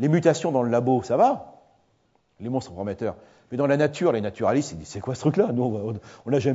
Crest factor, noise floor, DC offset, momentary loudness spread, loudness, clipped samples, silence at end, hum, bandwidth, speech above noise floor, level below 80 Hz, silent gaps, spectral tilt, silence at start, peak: 18 dB; -66 dBFS; under 0.1%; 12 LU; -24 LUFS; under 0.1%; 0 s; none; 8 kHz; 43 dB; -60 dBFS; none; -7 dB/octave; 0 s; -6 dBFS